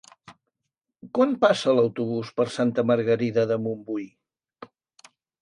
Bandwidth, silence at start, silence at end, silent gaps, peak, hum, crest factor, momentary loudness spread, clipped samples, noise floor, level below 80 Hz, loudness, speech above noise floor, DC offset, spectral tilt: 11 kHz; 0.3 s; 0.75 s; none; -4 dBFS; none; 20 dB; 11 LU; under 0.1%; -83 dBFS; -70 dBFS; -24 LUFS; 60 dB; under 0.1%; -6.5 dB/octave